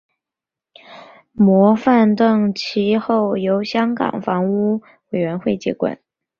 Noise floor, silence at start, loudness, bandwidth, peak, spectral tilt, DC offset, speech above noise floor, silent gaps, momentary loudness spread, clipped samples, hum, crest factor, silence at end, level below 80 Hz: -87 dBFS; 0.9 s; -17 LUFS; 7 kHz; -2 dBFS; -7.5 dB/octave; under 0.1%; 71 dB; none; 10 LU; under 0.1%; none; 16 dB; 0.45 s; -60 dBFS